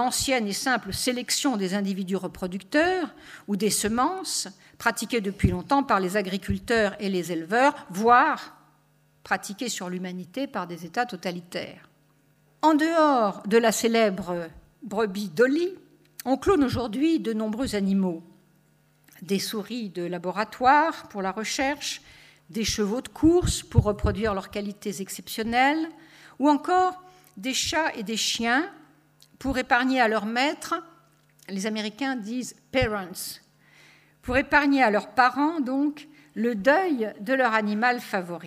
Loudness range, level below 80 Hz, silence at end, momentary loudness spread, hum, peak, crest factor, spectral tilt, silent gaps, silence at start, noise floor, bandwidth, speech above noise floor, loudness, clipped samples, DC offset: 5 LU; -46 dBFS; 0 s; 13 LU; none; -4 dBFS; 22 dB; -4 dB/octave; none; 0 s; -63 dBFS; 15.5 kHz; 38 dB; -25 LUFS; under 0.1%; under 0.1%